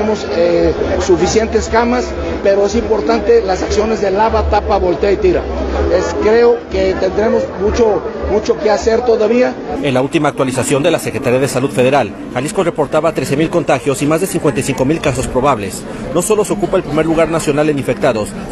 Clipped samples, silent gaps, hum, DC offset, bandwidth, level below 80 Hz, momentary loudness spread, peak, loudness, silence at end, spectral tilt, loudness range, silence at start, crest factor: under 0.1%; none; none; under 0.1%; 13.5 kHz; -28 dBFS; 4 LU; 0 dBFS; -14 LUFS; 0 s; -5.5 dB/octave; 2 LU; 0 s; 12 dB